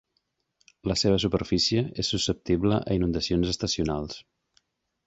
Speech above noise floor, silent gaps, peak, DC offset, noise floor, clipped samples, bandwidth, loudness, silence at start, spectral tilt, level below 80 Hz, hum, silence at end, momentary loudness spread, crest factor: 50 dB; none; -10 dBFS; under 0.1%; -76 dBFS; under 0.1%; 8.2 kHz; -26 LUFS; 0.85 s; -5 dB/octave; -44 dBFS; none; 0.85 s; 8 LU; 18 dB